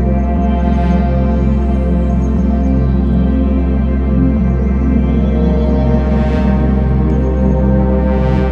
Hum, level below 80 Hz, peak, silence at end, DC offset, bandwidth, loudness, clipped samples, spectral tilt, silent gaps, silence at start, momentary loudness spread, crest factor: none; -14 dBFS; 0 dBFS; 0 s; under 0.1%; 4.3 kHz; -14 LUFS; under 0.1%; -10.5 dB/octave; none; 0 s; 2 LU; 12 dB